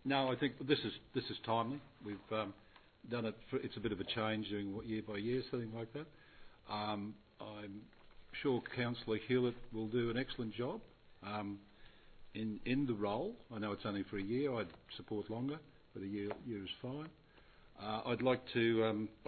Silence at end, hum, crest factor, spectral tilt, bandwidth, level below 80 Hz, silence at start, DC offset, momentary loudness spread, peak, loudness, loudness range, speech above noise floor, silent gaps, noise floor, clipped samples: 0 s; none; 22 dB; -4.5 dB/octave; 4.5 kHz; -66 dBFS; 0 s; under 0.1%; 14 LU; -18 dBFS; -40 LUFS; 5 LU; 24 dB; none; -63 dBFS; under 0.1%